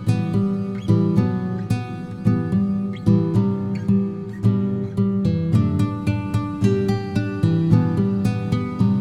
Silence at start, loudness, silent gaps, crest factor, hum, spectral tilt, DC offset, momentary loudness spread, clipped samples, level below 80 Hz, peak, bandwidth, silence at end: 0 s; -21 LUFS; none; 16 dB; none; -9 dB/octave; under 0.1%; 6 LU; under 0.1%; -46 dBFS; -4 dBFS; 11 kHz; 0 s